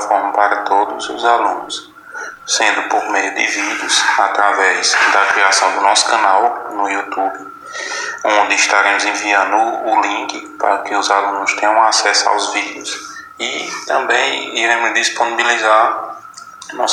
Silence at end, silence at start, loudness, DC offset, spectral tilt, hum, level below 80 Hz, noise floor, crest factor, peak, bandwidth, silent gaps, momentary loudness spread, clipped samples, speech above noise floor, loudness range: 0 s; 0 s; -14 LUFS; under 0.1%; 0.5 dB/octave; none; -66 dBFS; -35 dBFS; 16 dB; 0 dBFS; 13 kHz; none; 13 LU; under 0.1%; 20 dB; 4 LU